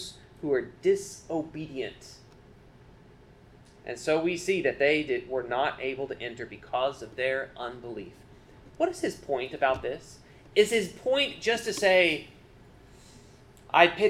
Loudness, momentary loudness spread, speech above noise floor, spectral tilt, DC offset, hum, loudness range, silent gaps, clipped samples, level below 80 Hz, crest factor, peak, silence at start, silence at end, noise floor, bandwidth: -28 LUFS; 17 LU; 26 dB; -3.5 dB/octave; under 0.1%; none; 8 LU; none; under 0.1%; -58 dBFS; 26 dB; -4 dBFS; 0 s; 0 s; -54 dBFS; 15.5 kHz